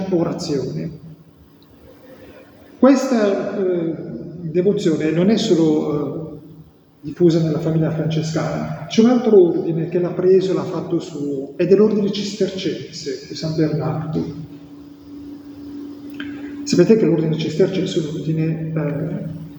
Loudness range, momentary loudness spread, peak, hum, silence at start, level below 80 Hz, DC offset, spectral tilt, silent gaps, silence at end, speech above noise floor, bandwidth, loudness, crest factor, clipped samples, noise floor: 7 LU; 19 LU; 0 dBFS; none; 0 s; -56 dBFS; under 0.1%; -7 dB/octave; none; 0 s; 30 dB; over 20 kHz; -19 LUFS; 20 dB; under 0.1%; -47 dBFS